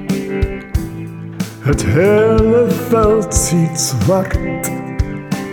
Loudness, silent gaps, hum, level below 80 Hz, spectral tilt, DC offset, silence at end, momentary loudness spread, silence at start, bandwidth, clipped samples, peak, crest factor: -15 LUFS; none; none; -26 dBFS; -5.5 dB/octave; under 0.1%; 0 s; 11 LU; 0 s; over 20 kHz; under 0.1%; -2 dBFS; 14 dB